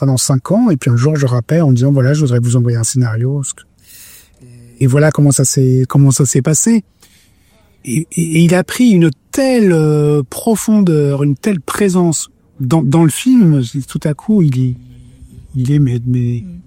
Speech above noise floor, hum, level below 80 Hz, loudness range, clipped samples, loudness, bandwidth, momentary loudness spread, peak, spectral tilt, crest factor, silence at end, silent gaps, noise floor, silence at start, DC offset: 39 dB; none; -46 dBFS; 2 LU; under 0.1%; -12 LUFS; 16.5 kHz; 9 LU; 0 dBFS; -6 dB/octave; 12 dB; 0.05 s; none; -50 dBFS; 0 s; under 0.1%